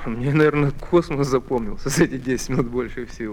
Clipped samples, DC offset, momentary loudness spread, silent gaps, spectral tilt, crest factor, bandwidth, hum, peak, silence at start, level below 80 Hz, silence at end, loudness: under 0.1%; under 0.1%; 8 LU; none; -6 dB/octave; 18 dB; 18 kHz; none; -2 dBFS; 0 s; -36 dBFS; 0 s; -21 LUFS